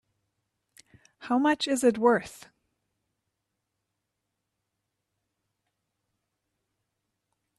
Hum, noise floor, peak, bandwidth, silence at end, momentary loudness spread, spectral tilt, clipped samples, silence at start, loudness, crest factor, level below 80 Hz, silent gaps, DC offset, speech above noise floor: none; -83 dBFS; -10 dBFS; 13 kHz; 5.25 s; 17 LU; -4 dB/octave; under 0.1%; 1.2 s; -25 LUFS; 24 dB; -74 dBFS; none; under 0.1%; 58 dB